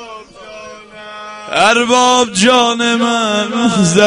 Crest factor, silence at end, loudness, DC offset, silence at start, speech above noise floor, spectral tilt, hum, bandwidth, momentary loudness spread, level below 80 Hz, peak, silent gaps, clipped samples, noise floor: 14 dB; 0 s; -11 LUFS; under 0.1%; 0 s; 22 dB; -3.5 dB/octave; none; 11 kHz; 22 LU; -50 dBFS; 0 dBFS; none; 0.1%; -33 dBFS